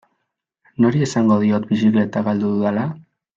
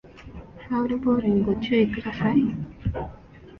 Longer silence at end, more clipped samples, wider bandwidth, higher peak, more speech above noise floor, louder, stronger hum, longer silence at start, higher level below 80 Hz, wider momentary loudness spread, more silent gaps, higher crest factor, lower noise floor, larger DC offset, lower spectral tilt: first, 0.35 s vs 0 s; neither; first, 7.8 kHz vs 6 kHz; first, -4 dBFS vs -8 dBFS; first, 59 dB vs 23 dB; first, -18 LUFS vs -24 LUFS; neither; first, 0.8 s vs 0.05 s; second, -60 dBFS vs -44 dBFS; second, 10 LU vs 21 LU; neither; about the same, 14 dB vs 16 dB; first, -76 dBFS vs -45 dBFS; neither; second, -7.5 dB/octave vs -9 dB/octave